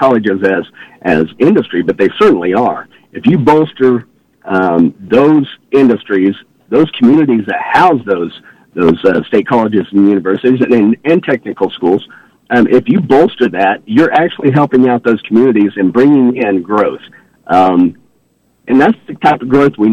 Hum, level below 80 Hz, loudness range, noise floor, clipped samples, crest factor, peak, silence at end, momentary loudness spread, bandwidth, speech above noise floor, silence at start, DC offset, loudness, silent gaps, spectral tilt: none; -50 dBFS; 2 LU; -55 dBFS; under 0.1%; 10 dB; 0 dBFS; 0 s; 7 LU; 8 kHz; 45 dB; 0 s; under 0.1%; -11 LUFS; none; -8 dB/octave